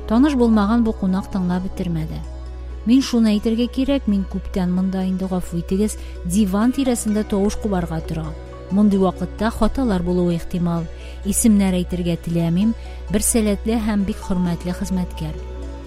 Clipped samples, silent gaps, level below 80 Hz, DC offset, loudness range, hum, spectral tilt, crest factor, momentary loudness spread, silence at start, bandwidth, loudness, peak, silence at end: under 0.1%; none; -32 dBFS; under 0.1%; 2 LU; none; -6 dB/octave; 16 dB; 12 LU; 0 s; 16 kHz; -20 LUFS; -2 dBFS; 0 s